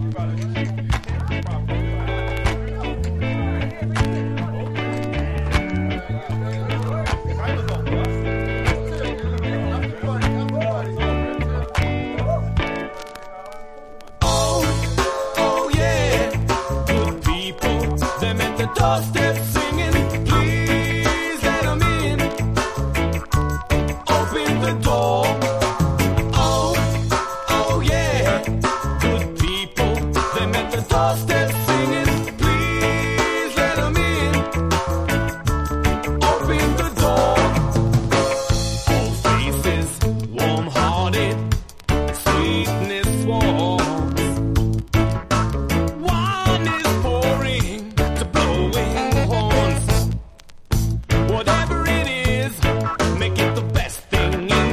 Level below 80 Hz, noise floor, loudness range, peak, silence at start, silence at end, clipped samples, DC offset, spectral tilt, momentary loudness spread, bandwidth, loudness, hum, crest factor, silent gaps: -28 dBFS; -40 dBFS; 4 LU; -4 dBFS; 0 s; 0 s; under 0.1%; under 0.1%; -5.5 dB/octave; 6 LU; 15.5 kHz; -20 LUFS; none; 16 dB; none